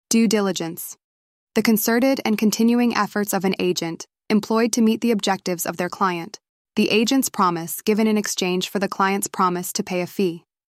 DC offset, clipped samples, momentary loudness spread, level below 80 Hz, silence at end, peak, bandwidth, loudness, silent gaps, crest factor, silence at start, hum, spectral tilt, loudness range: under 0.1%; under 0.1%; 8 LU; -66 dBFS; 0.35 s; -4 dBFS; 16 kHz; -21 LUFS; 1.04-1.47 s, 6.49-6.65 s; 16 dB; 0.1 s; none; -4 dB/octave; 2 LU